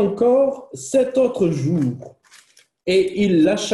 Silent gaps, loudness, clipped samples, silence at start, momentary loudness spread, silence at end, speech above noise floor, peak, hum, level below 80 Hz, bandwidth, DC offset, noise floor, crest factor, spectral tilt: none; -18 LUFS; under 0.1%; 0 s; 10 LU; 0 s; 36 dB; -6 dBFS; none; -56 dBFS; 12 kHz; under 0.1%; -54 dBFS; 12 dB; -6 dB/octave